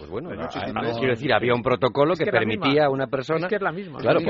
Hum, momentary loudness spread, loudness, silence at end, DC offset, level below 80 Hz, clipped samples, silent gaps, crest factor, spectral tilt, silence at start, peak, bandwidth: none; 9 LU; -23 LUFS; 0 s; under 0.1%; -54 dBFS; under 0.1%; none; 18 dB; -4 dB/octave; 0 s; -4 dBFS; 7.2 kHz